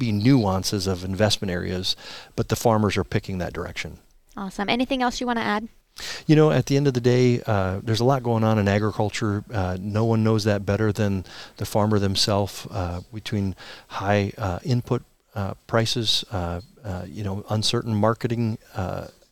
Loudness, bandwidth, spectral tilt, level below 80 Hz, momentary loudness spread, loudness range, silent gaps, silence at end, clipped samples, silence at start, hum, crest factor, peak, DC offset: -23 LUFS; 15.5 kHz; -5.5 dB/octave; -50 dBFS; 13 LU; 5 LU; none; 0.2 s; under 0.1%; 0 s; none; 18 dB; -4 dBFS; 0.3%